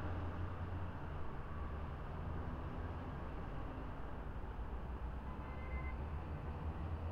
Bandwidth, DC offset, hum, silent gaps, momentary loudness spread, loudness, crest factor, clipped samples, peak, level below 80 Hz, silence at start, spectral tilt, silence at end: 5.8 kHz; under 0.1%; none; none; 3 LU; -47 LUFS; 12 dB; under 0.1%; -32 dBFS; -48 dBFS; 0 s; -8.5 dB/octave; 0 s